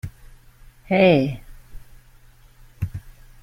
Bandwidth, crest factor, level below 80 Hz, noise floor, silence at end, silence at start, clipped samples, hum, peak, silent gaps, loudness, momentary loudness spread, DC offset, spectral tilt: 16 kHz; 20 dB; -44 dBFS; -50 dBFS; 0.35 s; 0.05 s; under 0.1%; none; -4 dBFS; none; -20 LUFS; 23 LU; under 0.1%; -7.5 dB/octave